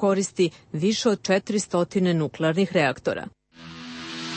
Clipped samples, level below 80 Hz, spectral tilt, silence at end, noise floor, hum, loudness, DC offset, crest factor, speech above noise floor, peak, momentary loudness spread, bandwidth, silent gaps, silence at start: under 0.1%; -64 dBFS; -5 dB/octave; 0 s; -43 dBFS; none; -24 LUFS; under 0.1%; 16 dB; 19 dB; -8 dBFS; 15 LU; 8.8 kHz; none; 0 s